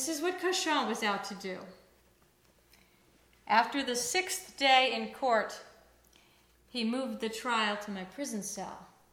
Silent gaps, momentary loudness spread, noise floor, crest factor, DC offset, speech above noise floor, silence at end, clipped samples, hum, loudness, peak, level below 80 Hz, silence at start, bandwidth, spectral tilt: none; 16 LU; -66 dBFS; 24 dB; under 0.1%; 34 dB; 0.25 s; under 0.1%; none; -31 LUFS; -10 dBFS; -72 dBFS; 0 s; 18.5 kHz; -2 dB/octave